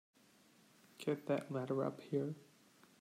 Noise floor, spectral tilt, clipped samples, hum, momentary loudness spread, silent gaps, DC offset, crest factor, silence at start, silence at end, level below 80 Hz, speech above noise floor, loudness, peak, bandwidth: -68 dBFS; -7.5 dB/octave; under 0.1%; none; 7 LU; none; under 0.1%; 18 dB; 1 s; 0.55 s; under -90 dBFS; 29 dB; -41 LUFS; -24 dBFS; 16 kHz